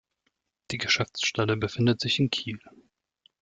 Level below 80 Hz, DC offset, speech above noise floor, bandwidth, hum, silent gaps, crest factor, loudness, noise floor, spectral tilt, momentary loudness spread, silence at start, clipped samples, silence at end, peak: -60 dBFS; under 0.1%; 51 dB; 9.2 kHz; none; none; 18 dB; -26 LUFS; -77 dBFS; -4.5 dB/octave; 12 LU; 0.7 s; under 0.1%; 0.75 s; -10 dBFS